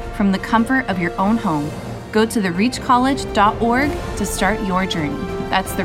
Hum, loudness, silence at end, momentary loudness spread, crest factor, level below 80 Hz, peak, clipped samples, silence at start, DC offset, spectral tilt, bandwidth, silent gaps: none; -18 LUFS; 0 s; 7 LU; 18 dB; -34 dBFS; 0 dBFS; under 0.1%; 0 s; under 0.1%; -5 dB/octave; 17 kHz; none